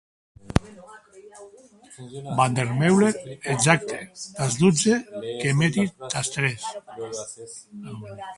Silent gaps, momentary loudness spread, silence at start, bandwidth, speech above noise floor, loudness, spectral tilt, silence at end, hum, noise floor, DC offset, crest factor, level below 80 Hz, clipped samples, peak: none; 19 LU; 0.45 s; 11.5 kHz; 23 dB; -23 LUFS; -5 dB/octave; 0 s; none; -47 dBFS; under 0.1%; 24 dB; -48 dBFS; under 0.1%; 0 dBFS